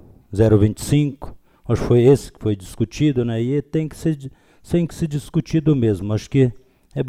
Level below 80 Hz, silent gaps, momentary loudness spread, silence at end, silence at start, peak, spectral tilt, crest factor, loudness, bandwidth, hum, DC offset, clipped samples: -40 dBFS; none; 13 LU; 0 s; 0.3 s; -4 dBFS; -7.5 dB/octave; 16 dB; -19 LUFS; 15 kHz; none; under 0.1%; under 0.1%